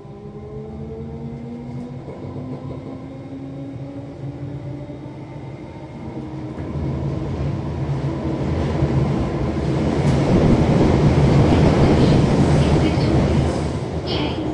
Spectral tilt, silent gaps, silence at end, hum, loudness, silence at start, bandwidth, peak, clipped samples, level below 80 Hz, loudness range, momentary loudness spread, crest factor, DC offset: -8 dB/octave; none; 0 s; none; -19 LUFS; 0 s; 10.5 kHz; -4 dBFS; under 0.1%; -32 dBFS; 16 LU; 18 LU; 16 dB; under 0.1%